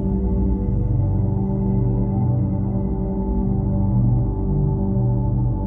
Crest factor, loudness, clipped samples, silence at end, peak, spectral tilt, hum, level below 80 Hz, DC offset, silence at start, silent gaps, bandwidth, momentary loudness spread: 10 dB; -21 LUFS; under 0.1%; 0 s; -8 dBFS; -14.5 dB/octave; 60 Hz at -30 dBFS; -26 dBFS; under 0.1%; 0 s; none; 2.1 kHz; 3 LU